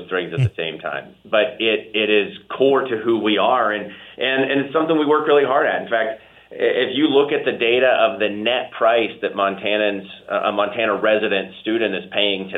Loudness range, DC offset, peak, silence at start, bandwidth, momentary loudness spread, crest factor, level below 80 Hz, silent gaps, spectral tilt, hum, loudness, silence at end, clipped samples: 2 LU; under 0.1%; -2 dBFS; 0 s; 4.1 kHz; 9 LU; 16 dB; -60 dBFS; none; -7.5 dB/octave; none; -19 LUFS; 0 s; under 0.1%